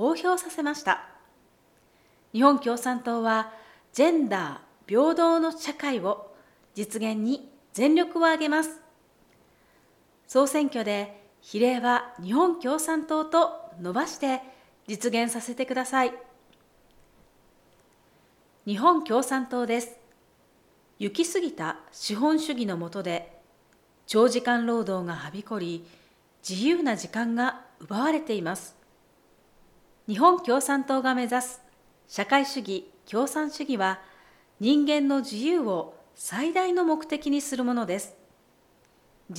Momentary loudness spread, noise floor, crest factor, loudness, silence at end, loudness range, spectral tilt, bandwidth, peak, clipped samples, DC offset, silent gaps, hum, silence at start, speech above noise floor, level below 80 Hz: 13 LU; -62 dBFS; 22 dB; -26 LUFS; 0 s; 4 LU; -4 dB/octave; 16.5 kHz; -6 dBFS; under 0.1%; under 0.1%; none; none; 0 s; 37 dB; -70 dBFS